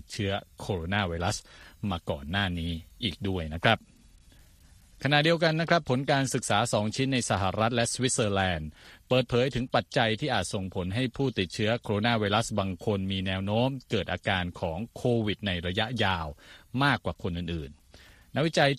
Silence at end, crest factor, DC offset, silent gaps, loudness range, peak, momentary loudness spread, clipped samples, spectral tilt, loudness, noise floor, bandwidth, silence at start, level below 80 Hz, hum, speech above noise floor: 0 s; 22 dB; under 0.1%; none; 5 LU; -6 dBFS; 9 LU; under 0.1%; -4.5 dB/octave; -28 LUFS; -56 dBFS; 14 kHz; 0.1 s; -50 dBFS; none; 28 dB